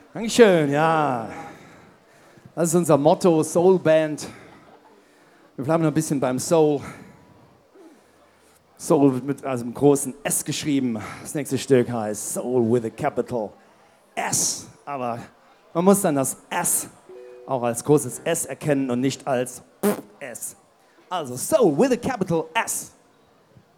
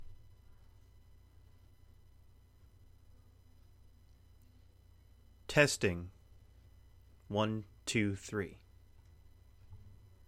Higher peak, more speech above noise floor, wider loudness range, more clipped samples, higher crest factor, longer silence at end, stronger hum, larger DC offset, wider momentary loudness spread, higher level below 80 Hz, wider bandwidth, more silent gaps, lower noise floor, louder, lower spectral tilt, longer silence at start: first, 0 dBFS vs -12 dBFS; first, 36 dB vs 28 dB; about the same, 4 LU vs 5 LU; neither; second, 22 dB vs 28 dB; first, 0.9 s vs 0.35 s; neither; neither; second, 16 LU vs 29 LU; about the same, -62 dBFS vs -60 dBFS; first, 18 kHz vs 16 kHz; neither; second, -57 dBFS vs -62 dBFS; first, -22 LUFS vs -34 LUFS; about the same, -5 dB/octave vs -4.5 dB/octave; first, 0.15 s vs 0 s